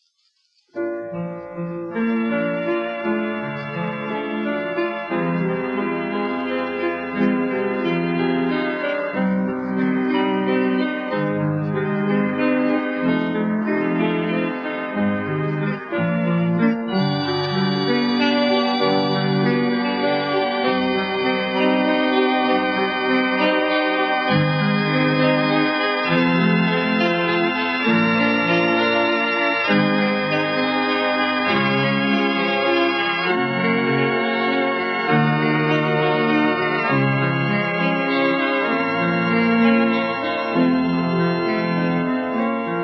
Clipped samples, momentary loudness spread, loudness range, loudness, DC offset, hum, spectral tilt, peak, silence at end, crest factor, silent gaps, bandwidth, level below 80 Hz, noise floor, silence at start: under 0.1%; 6 LU; 5 LU; -20 LUFS; under 0.1%; none; -8 dB/octave; -4 dBFS; 0 s; 14 dB; none; 6.6 kHz; -62 dBFS; -65 dBFS; 0.75 s